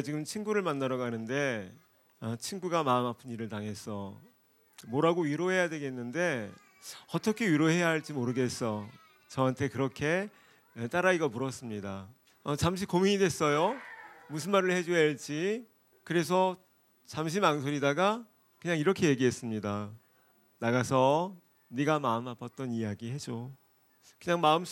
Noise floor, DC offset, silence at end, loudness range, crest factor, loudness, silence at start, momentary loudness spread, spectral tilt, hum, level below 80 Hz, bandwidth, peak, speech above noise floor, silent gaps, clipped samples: -66 dBFS; under 0.1%; 0 s; 3 LU; 22 dB; -31 LUFS; 0 s; 15 LU; -5.5 dB/octave; none; -68 dBFS; 17 kHz; -10 dBFS; 36 dB; none; under 0.1%